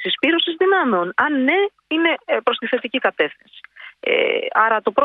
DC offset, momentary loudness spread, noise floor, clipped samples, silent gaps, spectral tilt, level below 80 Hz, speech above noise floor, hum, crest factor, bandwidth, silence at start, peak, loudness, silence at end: under 0.1%; 5 LU; -42 dBFS; under 0.1%; none; -6 dB/octave; -68 dBFS; 23 dB; none; 16 dB; 4.8 kHz; 0 s; -2 dBFS; -18 LUFS; 0 s